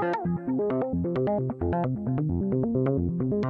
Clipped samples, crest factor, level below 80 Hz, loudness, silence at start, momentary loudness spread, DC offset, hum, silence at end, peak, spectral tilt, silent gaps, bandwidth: under 0.1%; 12 dB; -50 dBFS; -27 LUFS; 0 s; 3 LU; under 0.1%; none; 0 s; -14 dBFS; -11 dB/octave; none; 5.4 kHz